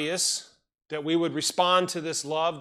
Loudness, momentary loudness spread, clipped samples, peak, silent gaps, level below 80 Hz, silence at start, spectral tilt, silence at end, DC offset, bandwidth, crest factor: -26 LUFS; 10 LU; under 0.1%; -8 dBFS; none; -76 dBFS; 0 s; -2.5 dB/octave; 0 s; under 0.1%; 15 kHz; 18 dB